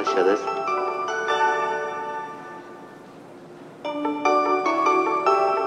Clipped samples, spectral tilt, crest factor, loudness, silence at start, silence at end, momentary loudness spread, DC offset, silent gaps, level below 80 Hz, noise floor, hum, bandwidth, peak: under 0.1%; -4 dB/octave; 18 dB; -23 LUFS; 0 s; 0 s; 23 LU; under 0.1%; none; -76 dBFS; -43 dBFS; none; 10 kHz; -6 dBFS